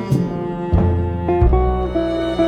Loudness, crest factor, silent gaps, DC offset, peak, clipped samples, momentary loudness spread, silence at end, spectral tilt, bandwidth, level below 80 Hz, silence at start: -19 LUFS; 14 dB; none; under 0.1%; -2 dBFS; under 0.1%; 4 LU; 0 s; -9 dB/octave; 8.8 kHz; -24 dBFS; 0 s